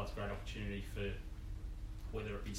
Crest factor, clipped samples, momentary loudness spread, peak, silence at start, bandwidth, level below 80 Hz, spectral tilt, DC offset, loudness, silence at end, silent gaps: 14 dB; under 0.1%; 6 LU; -28 dBFS; 0 s; 16 kHz; -46 dBFS; -5.5 dB/octave; under 0.1%; -45 LUFS; 0 s; none